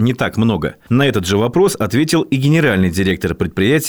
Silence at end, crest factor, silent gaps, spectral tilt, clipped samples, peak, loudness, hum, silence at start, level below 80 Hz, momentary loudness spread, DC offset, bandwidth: 0 s; 12 dB; none; -5.5 dB/octave; under 0.1%; -4 dBFS; -15 LUFS; none; 0 s; -42 dBFS; 5 LU; 0.3%; over 20 kHz